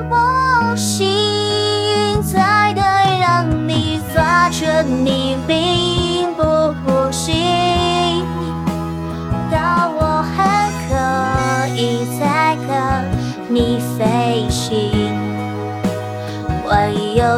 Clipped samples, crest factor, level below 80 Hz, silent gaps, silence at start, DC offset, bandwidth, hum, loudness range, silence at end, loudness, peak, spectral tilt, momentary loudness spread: under 0.1%; 16 dB; -34 dBFS; none; 0 s; under 0.1%; 16.5 kHz; none; 4 LU; 0 s; -16 LUFS; 0 dBFS; -5 dB/octave; 8 LU